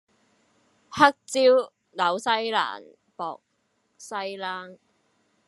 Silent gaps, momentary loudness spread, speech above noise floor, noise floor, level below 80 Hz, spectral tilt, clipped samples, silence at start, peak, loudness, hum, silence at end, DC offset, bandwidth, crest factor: none; 18 LU; 48 dB; -72 dBFS; -74 dBFS; -3 dB/octave; under 0.1%; 0.9 s; -2 dBFS; -24 LUFS; none; 0.75 s; under 0.1%; 12 kHz; 26 dB